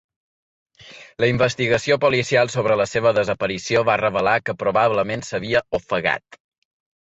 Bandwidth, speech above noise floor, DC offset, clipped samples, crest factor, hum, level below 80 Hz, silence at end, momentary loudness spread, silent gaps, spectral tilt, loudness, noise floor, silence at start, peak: 8.2 kHz; 25 dB; under 0.1%; under 0.1%; 16 dB; none; -52 dBFS; 0.75 s; 6 LU; none; -5 dB/octave; -20 LUFS; -44 dBFS; 0.85 s; -4 dBFS